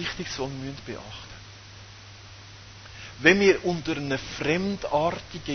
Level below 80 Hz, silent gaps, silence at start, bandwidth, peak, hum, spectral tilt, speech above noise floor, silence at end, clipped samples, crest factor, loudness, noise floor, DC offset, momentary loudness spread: -52 dBFS; none; 0 s; 6.6 kHz; -2 dBFS; none; -5 dB/octave; 20 dB; 0 s; under 0.1%; 26 dB; -25 LUFS; -46 dBFS; under 0.1%; 25 LU